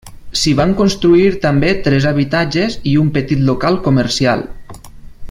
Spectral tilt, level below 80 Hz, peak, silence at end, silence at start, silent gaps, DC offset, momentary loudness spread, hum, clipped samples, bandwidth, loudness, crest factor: -6 dB/octave; -34 dBFS; 0 dBFS; 0 s; 0.05 s; none; under 0.1%; 6 LU; none; under 0.1%; 15.5 kHz; -14 LUFS; 14 dB